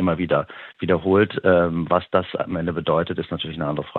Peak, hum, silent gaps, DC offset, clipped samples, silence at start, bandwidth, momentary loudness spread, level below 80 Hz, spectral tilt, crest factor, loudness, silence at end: -2 dBFS; none; none; under 0.1%; under 0.1%; 0 s; 4.3 kHz; 9 LU; -50 dBFS; -9.5 dB/octave; 18 dB; -21 LUFS; 0 s